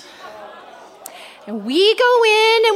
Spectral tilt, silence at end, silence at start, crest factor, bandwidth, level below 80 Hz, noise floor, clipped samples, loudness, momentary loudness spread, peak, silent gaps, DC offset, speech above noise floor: -2 dB/octave; 0 s; 0.2 s; 14 dB; 15.5 kHz; -74 dBFS; -40 dBFS; under 0.1%; -13 LUFS; 25 LU; -2 dBFS; none; under 0.1%; 26 dB